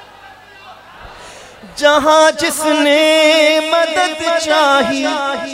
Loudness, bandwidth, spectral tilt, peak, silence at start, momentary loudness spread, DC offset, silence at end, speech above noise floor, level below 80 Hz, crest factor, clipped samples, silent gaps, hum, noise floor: -12 LUFS; 16 kHz; -1.5 dB/octave; 0 dBFS; 0.25 s; 7 LU; under 0.1%; 0 s; 26 dB; -52 dBFS; 14 dB; under 0.1%; none; none; -39 dBFS